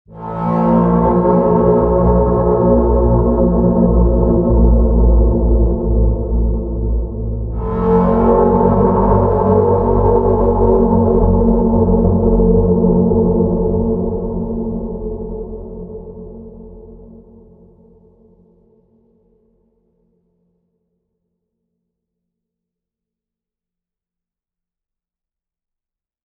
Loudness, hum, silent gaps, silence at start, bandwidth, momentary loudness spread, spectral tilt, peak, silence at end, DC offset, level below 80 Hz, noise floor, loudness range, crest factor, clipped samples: -14 LUFS; none; none; 0.1 s; 2.4 kHz; 12 LU; -13.5 dB/octave; 0 dBFS; 9.2 s; under 0.1%; -20 dBFS; -88 dBFS; 12 LU; 14 dB; under 0.1%